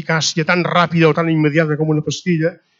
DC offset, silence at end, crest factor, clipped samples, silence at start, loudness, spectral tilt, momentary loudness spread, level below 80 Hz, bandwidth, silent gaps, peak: under 0.1%; 0.25 s; 16 dB; under 0.1%; 0 s; -16 LUFS; -5.5 dB/octave; 5 LU; -62 dBFS; 7.8 kHz; none; 0 dBFS